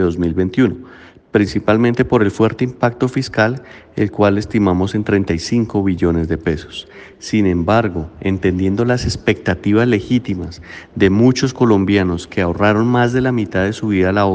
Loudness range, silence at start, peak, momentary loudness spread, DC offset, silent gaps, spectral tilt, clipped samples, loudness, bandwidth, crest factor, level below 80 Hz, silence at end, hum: 3 LU; 0 s; 0 dBFS; 8 LU; under 0.1%; none; -7 dB/octave; under 0.1%; -16 LUFS; 9.4 kHz; 16 dB; -40 dBFS; 0 s; none